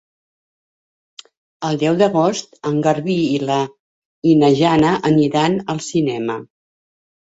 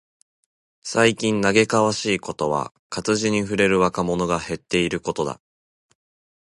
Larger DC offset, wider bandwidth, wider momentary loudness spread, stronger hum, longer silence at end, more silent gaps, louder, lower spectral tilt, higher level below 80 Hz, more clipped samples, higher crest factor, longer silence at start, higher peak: neither; second, 8 kHz vs 11.5 kHz; about the same, 11 LU vs 9 LU; neither; second, 0.85 s vs 1.15 s; first, 3.80-4.22 s vs 2.79-2.90 s; first, -17 LUFS vs -21 LUFS; first, -6 dB/octave vs -4.5 dB/octave; about the same, -56 dBFS vs -52 dBFS; neither; about the same, 16 dB vs 20 dB; first, 1.6 s vs 0.85 s; about the same, -2 dBFS vs -2 dBFS